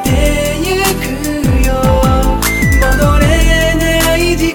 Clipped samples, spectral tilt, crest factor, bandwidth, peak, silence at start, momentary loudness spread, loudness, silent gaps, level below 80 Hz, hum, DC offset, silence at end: under 0.1%; -5 dB/octave; 10 dB; over 20 kHz; 0 dBFS; 0 s; 4 LU; -12 LUFS; none; -14 dBFS; none; under 0.1%; 0 s